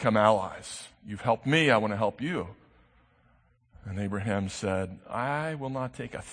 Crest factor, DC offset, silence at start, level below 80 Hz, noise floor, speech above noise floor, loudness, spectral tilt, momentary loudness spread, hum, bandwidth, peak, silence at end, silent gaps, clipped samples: 22 dB; under 0.1%; 0 s; -60 dBFS; -65 dBFS; 36 dB; -29 LUFS; -5.5 dB/octave; 17 LU; none; 9.8 kHz; -8 dBFS; 0 s; none; under 0.1%